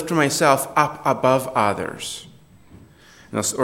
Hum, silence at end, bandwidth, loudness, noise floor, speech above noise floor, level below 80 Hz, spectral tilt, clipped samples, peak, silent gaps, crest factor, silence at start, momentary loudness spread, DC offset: none; 0 s; 17.5 kHz; -20 LUFS; -48 dBFS; 28 dB; -58 dBFS; -4 dB/octave; under 0.1%; 0 dBFS; none; 20 dB; 0 s; 13 LU; under 0.1%